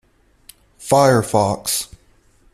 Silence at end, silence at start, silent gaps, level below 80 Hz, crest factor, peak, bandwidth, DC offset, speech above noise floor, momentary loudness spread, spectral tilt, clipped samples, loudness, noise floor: 0.7 s; 0.8 s; none; -52 dBFS; 18 dB; -2 dBFS; 16 kHz; under 0.1%; 39 dB; 17 LU; -4.5 dB/octave; under 0.1%; -17 LUFS; -54 dBFS